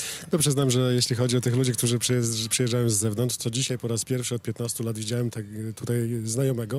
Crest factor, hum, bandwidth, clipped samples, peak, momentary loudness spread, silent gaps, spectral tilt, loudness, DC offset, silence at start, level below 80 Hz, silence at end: 16 dB; none; 16 kHz; under 0.1%; -10 dBFS; 7 LU; none; -4.5 dB/octave; -25 LUFS; under 0.1%; 0 s; -62 dBFS; 0 s